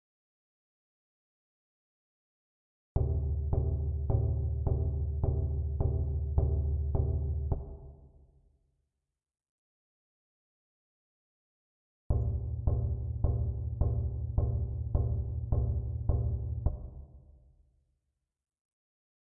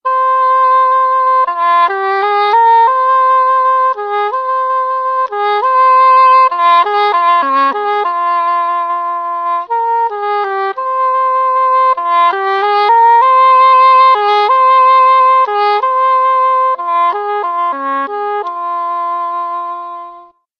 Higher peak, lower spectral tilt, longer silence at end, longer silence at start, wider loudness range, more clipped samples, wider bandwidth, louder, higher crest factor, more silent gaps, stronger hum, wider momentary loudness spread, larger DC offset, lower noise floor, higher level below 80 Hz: second, -14 dBFS vs 0 dBFS; first, -14.5 dB/octave vs -2 dB/octave; first, 2.2 s vs 0.4 s; first, 2.95 s vs 0.05 s; about the same, 8 LU vs 7 LU; neither; second, 1.4 kHz vs 5.6 kHz; second, -33 LUFS vs -11 LUFS; first, 20 dB vs 10 dB; first, 9.49-12.10 s vs none; neither; second, 4 LU vs 10 LU; neither; first, -88 dBFS vs -38 dBFS; first, -38 dBFS vs -68 dBFS